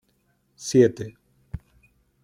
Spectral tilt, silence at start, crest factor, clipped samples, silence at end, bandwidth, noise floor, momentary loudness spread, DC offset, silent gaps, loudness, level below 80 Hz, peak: -6 dB/octave; 0.6 s; 22 dB; under 0.1%; 0.65 s; 12 kHz; -68 dBFS; 22 LU; under 0.1%; none; -20 LUFS; -52 dBFS; -4 dBFS